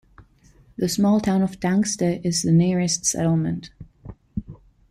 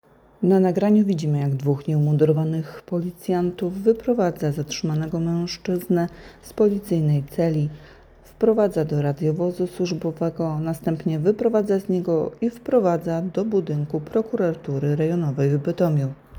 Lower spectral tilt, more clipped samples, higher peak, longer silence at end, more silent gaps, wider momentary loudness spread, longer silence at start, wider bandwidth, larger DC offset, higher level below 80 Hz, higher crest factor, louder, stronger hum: second, -5 dB/octave vs -8 dB/octave; neither; about the same, -8 dBFS vs -6 dBFS; first, 0.35 s vs 0 s; neither; first, 16 LU vs 7 LU; second, 0.2 s vs 0.4 s; second, 15 kHz vs 20 kHz; neither; about the same, -50 dBFS vs -54 dBFS; about the same, 14 dB vs 16 dB; about the same, -21 LUFS vs -22 LUFS; neither